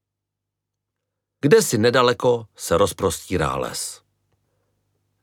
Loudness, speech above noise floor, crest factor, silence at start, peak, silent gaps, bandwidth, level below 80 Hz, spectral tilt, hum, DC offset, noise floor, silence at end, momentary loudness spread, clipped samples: -20 LUFS; 63 dB; 20 dB; 1.45 s; -2 dBFS; none; 18 kHz; -48 dBFS; -4.5 dB/octave; 50 Hz at -50 dBFS; under 0.1%; -83 dBFS; 1.3 s; 10 LU; under 0.1%